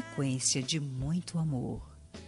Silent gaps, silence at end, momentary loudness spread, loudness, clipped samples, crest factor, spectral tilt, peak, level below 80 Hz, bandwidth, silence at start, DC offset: none; 0 s; 12 LU; -32 LUFS; under 0.1%; 20 dB; -4 dB/octave; -14 dBFS; -52 dBFS; 11.5 kHz; 0 s; under 0.1%